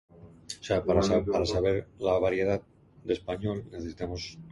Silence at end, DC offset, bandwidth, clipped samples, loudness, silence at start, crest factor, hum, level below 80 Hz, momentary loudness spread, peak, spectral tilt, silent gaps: 0 s; under 0.1%; 11.5 kHz; under 0.1%; -29 LUFS; 0.2 s; 18 dB; none; -46 dBFS; 14 LU; -10 dBFS; -6 dB/octave; none